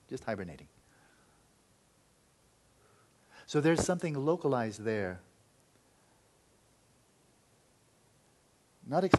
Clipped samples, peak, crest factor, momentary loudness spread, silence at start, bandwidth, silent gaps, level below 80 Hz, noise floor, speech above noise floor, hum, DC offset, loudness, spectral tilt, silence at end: under 0.1%; -6 dBFS; 30 dB; 21 LU; 0.1 s; 12 kHz; none; -64 dBFS; -68 dBFS; 37 dB; none; under 0.1%; -33 LUFS; -6 dB/octave; 0 s